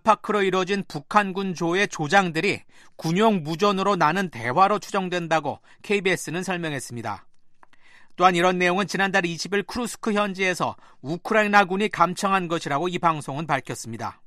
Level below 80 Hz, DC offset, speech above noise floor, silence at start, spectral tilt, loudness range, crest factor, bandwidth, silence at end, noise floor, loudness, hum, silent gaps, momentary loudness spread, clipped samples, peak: -60 dBFS; under 0.1%; 25 dB; 0.05 s; -4.5 dB/octave; 3 LU; 22 dB; 13.5 kHz; 0.15 s; -48 dBFS; -23 LUFS; none; none; 12 LU; under 0.1%; -2 dBFS